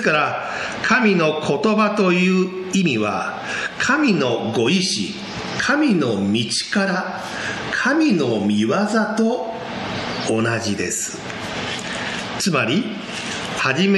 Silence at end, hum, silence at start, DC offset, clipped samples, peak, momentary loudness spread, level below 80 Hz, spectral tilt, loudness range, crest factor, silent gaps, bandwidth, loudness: 0 s; none; 0 s; under 0.1%; under 0.1%; -4 dBFS; 9 LU; -54 dBFS; -4.5 dB/octave; 4 LU; 16 dB; none; 12.5 kHz; -20 LUFS